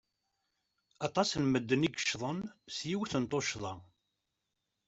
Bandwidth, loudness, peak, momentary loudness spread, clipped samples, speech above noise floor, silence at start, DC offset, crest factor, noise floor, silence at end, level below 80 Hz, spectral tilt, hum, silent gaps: 8.2 kHz; -34 LUFS; -14 dBFS; 11 LU; under 0.1%; 51 dB; 1 s; under 0.1%; 22 dB; -85 dBFS; 1.05 s; -68 dBFS; -4.5 dB/octave; none; none